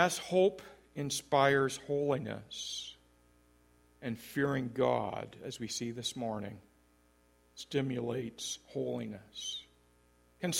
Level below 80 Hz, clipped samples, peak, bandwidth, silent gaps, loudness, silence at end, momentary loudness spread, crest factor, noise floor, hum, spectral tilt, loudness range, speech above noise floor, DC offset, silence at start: -68 dBFS; under 0.1%; -10 dBFS; 16.5 kHz; none; -35 LUFS; 0 s; 15 LU; 24 dB; -68 dBFS; 60 Hz at -65 dBFS; -4 dB/octave; 6 LU; 33 dB; under 0.1%; 0 s